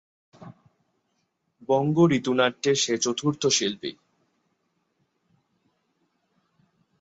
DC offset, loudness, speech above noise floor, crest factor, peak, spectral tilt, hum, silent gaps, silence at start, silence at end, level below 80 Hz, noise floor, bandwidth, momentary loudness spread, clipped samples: under 0.1%; -23 LUFS; 51 dB; 20 dB; -6 dBFS; -4 dB/octave; none; none; 0.4 s; 3.1 s; -68 dBFS; -75 dBFS; 8.2 kHz; 12 LU; under 0.1%